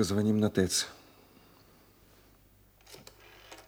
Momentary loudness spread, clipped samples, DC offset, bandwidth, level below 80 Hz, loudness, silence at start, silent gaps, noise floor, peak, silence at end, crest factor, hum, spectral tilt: 25 LU; under 0.1%; under 0.1%; 18 kHz; -64 dBFS; -29 LUFS; 0 s; none; -62 dBFS; -12 dBFS; 0.1 s; 22 dB; none; -4.5 dB/octave